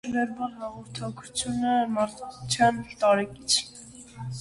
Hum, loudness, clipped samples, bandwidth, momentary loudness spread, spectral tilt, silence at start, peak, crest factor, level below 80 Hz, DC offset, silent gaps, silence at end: none; -26 LUFS; under 0.1%; 11.5 kHz; 16 LU; -3.5 dB/octave; 0.05 s; -8 dBFS; 20 dB; -58 dBFS; under 0.1%; none; 0 s